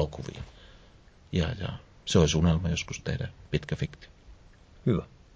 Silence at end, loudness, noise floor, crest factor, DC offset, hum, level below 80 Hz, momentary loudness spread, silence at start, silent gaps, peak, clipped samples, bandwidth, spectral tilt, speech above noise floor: 0.3 s; -29 LUFS; -55 dBFS; 20 dB; under 0.1%; none; -40 dBFS; 16 LU; 0 s; none; -10 dBFS; under 0.1%; 8 kHz; -5.5 dB/octave; 27 dB